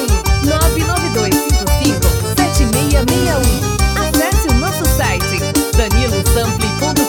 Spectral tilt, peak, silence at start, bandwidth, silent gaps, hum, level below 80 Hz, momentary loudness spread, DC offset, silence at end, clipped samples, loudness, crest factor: -4.5 dB/octave; 0 dBFS; 0 s; over 20 kHz; none; none; -18 dBFS; 2 LU; under 0.1%; 0 s; under 0.1%; -14 LUFS; 14 dB